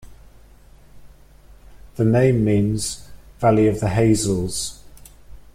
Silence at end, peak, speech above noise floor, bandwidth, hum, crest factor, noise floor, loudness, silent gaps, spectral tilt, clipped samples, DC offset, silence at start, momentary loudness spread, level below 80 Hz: 0.15 s; -4 dBFS; 29 dB; 15.5 kHz; none; 16 dB; -47 dBFS; -19 LUFS; none; -6 dB/octave; under 0.1%; under 0.1%; 0.05 s; 11 LU; -42 dBFS